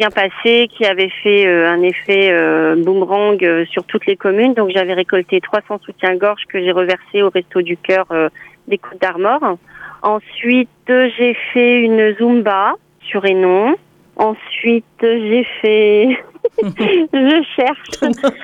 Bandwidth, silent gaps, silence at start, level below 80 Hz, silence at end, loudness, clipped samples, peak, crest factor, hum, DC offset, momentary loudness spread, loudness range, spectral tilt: 8 kHz; none; 0 s; -60 dBFS; 0 s; -14 LUFS; under 0.1%; -2 dBFS; 12 dB; none; under 0.1%; 8 LU; 4 LU; -5.5 dB/octave